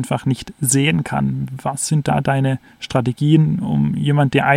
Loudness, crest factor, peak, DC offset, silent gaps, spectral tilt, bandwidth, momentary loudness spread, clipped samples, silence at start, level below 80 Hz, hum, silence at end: -18 LUFS; 16 dB; 0 dBFS; under 0.1%; none; -5.5 dB/octave; 14.5 kHz; 7 LU; under 0.1%; 0 s; -46 dBFS; none; 0 s